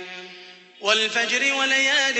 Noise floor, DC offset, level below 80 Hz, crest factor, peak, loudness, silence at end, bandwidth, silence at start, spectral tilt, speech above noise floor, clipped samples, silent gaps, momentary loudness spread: -45 dBFS; under 0.1%; -82 dBFS; 18 dB; -6 dBFS; -19 LUFS; 0 s; 8.4 kHz; 0 s; 0.5 dB/octave; 24 dB; under 0.1%; none; 19 LU